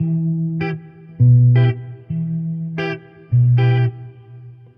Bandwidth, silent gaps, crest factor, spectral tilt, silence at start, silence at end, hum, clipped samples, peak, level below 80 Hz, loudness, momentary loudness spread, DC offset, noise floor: 5 kHz; none; 12 dB; -10.5 dB/octave; 0 s; 0.25 s; none; under 0.1%; -4 dBFS; -50 dBFS; -17 LUFS; 17 LU; under 0.1%; -39 dBFS